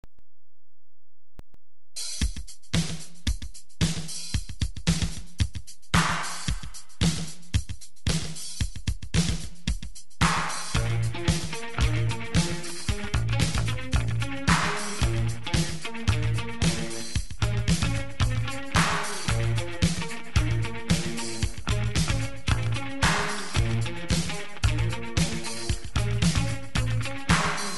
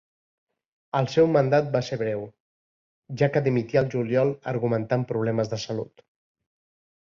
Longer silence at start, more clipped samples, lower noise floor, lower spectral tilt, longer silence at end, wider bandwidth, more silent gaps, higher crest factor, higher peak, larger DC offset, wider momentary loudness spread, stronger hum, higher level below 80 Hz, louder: second, 0.05 s vs 0.95 s; neither; second, -75 dBFS vs under -90 dBFS; second, -4.5 dB/octave vs -7 dB/octave; second, 0 s vs 1.15 s; first, 12 kHz vs 7.4 kHz; second, none vs 2.40-3.02 s; about the same, 20 dB vs 18 dB; about the same, -8 dBFS vs -8 dBFS; first, 3% vs under 0.1%; second, 9 LU vs 12 LU; neither; first, -34 dBFS vs -62 dBFS; second, -28 LUFS vs -25 LUFS